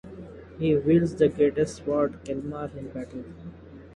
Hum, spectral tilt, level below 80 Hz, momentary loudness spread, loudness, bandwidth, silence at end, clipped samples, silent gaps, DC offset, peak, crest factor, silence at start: none; -7.5 dB/octave; -50 dBFS; 22 LU; -25 LUFS; 11.5 kHz; 0 s; under 0.1%; none; under 0.1%; -8 dBFS; 18 dB; 0.05 s